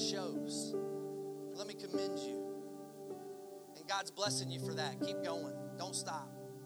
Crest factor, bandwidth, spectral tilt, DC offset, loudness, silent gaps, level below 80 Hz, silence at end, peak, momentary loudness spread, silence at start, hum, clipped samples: 20 dB; over 20 kHz; -3.5 dB/octave; under 0.1%; -42 LUFS; none; -88 dBFS; 0 s; -22 dBFS; 13 LU; 0 s; none; under 0.1%